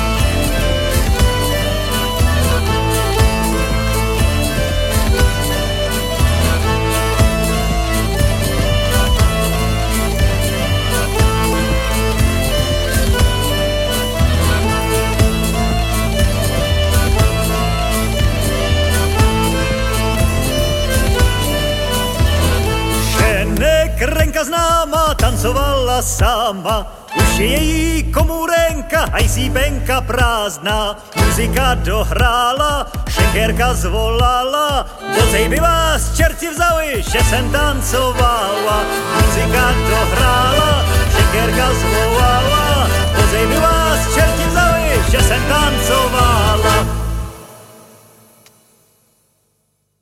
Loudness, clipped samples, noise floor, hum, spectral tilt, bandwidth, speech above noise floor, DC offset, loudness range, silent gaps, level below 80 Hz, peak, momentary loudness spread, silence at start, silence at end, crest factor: -15 LUFS; under 0.1%; -64 dBFS; none; -4.5 dB/octave; 17 kHz; 51 dB; under 0.1%; 3 LU; none; -20 dBFS; 0 dBFS; 4 LU; 0 s; 2.35 s; 14 dB